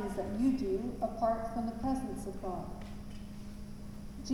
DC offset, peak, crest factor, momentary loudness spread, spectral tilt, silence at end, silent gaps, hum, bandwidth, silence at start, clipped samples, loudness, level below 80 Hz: under 0.1%; -20 dBFS; 16 dB; 15 LU; -7 dB/octave; 0 s; none; none; 17 kHz; 0 s; under 0.1%; -36 LUFS; -48 dBFS